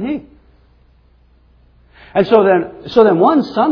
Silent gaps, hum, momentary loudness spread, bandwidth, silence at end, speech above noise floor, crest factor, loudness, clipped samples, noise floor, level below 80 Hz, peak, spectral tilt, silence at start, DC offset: none; none; 11 LU; 5.4 kHz; 0 s; 39 dB; 16 dB; -13 LUFS; under 0.1%; -50 dBFS; -50 dBFS; 0 dBFS; -8 dB/octave; 0 s; under 0.1%